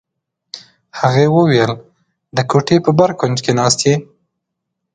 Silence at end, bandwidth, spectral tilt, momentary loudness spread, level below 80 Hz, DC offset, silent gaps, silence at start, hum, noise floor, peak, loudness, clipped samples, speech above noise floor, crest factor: 0.9 s; 9.6 kHz; -5.5 dB/octave; 21 LU; -52 dBFS; under 0.1%; none; 0.55 s; none; -76 dBFS; 0 dBFS; -14 LUFS; under 0.1%; 63 dB; 16 dB